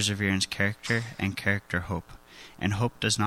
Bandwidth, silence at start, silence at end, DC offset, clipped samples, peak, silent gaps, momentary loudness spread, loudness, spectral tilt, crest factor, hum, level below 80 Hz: 16 kHz; 0 s; 0 s; under 0.1%; under 0.1%; -10 dBFS; none; 10 LU; -28 LUFS; -4 dB/octave; 18 dB; none; -52 dBFS